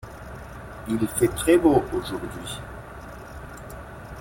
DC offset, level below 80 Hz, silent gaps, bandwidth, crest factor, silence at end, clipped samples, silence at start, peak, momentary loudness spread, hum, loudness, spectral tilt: under 0.1%; -44 dBFS; none; 16.5 kHz; 20 dB; 0 s; under 0.1%; 0 s; -6 dBFS; 21 LU; none; -23 LUFS; -5.5 dB/octave